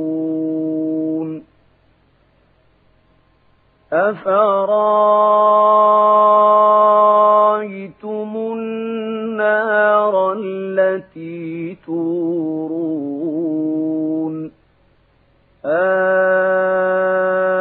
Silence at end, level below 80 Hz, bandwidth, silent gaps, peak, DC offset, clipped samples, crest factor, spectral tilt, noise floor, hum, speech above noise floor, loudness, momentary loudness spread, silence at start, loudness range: 0 s; -66 dBFS; 4 kHz; none; -2 dBFS; under 0.1%; under 0.1%; 14 dB; -10 dB/octave; -56 dBFS; none; 43 dB; -16 LUFS; 15 LU; 0 s; 11 LU